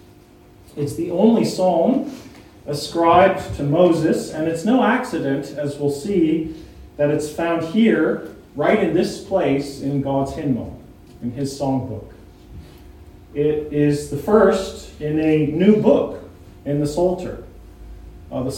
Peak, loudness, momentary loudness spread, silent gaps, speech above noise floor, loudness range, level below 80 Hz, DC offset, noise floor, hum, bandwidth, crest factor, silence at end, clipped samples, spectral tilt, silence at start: 0 dBFS; -19 LUFS; 16 LU; none; 29 dB; 6 LU; -44 dBFS; under 0.1%; -47 dBFS; none; 16.5 kHz; 18 dB; 0 s; under 0.1%; -6.5 dB/octave; 0.75 s